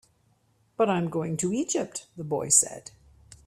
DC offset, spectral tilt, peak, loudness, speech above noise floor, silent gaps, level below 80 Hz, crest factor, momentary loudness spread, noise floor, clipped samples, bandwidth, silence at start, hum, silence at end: under 0.1%; -4 dB/octave; -4 dBFS; -25 LUFS; 40 dB; none; -64 dBFS; 26 dB; 16 LU; -67 dBFS; under 0.1%; 15.5 kHz; 0.8 s; none; 0.1 s